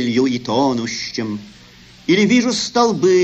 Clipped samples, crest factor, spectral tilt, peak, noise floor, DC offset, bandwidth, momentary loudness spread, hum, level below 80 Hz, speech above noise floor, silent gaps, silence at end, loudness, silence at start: under 0.1%; 16 dB; -4.5 dB/octave; -2 dBFS; -44 dBFS; under 0.1%; 8.6 kHz; 12 LU; none; -54 dBFS; 27 dB; none; 0 s; -17 LUFS; 0 s